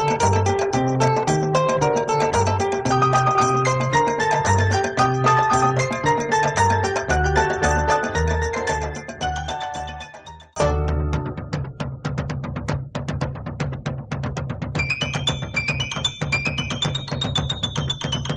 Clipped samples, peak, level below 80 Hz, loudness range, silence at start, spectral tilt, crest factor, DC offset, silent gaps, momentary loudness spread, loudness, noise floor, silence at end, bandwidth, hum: under 0.1%; -4 dBFS; -34 dBFS; 8 LU; 0 s; -4.5 dB/octave; 16 dB; under 0.1%; none; 10 LU; -21 LUFS; -41 dBFS; 0 s; 11 kHz; none